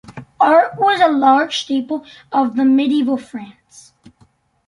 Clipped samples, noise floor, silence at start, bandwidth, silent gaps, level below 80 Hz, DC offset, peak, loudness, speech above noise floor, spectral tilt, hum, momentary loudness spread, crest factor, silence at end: under 0.1%; -55 dBFS; 0.1 s; 11 kHz; none; -62 dBFS; under 0.1%; -2 dBFS; -15 LUFS; 40 dB; -4.5 dB/octave; none; 13 LU; 16 dB; 1.15 s